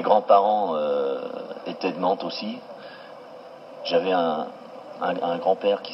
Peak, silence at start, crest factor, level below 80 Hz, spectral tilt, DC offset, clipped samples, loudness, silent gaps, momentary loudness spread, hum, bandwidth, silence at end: -4 dBFS; 0 s; 20 dB; -88 dBFS; -6.5 dB/octave; under 0.1%; under 0.1%; -24 LUFS; none; 23 LU; none; 6 kHz; 0 s